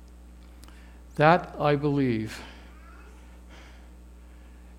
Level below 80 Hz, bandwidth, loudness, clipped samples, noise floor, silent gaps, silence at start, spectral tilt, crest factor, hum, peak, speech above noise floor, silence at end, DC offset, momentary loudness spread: -48 dBFS; 14.5 kHz; -24 LUFS; under 0.1%; -48 dBFS; none; 0.3 s; -7 dB/octave; 26 dB; 60 Hz at -50 dBFS; -4 dBFS; 24 dB; 0.05 s; under 0.1%; 28 LU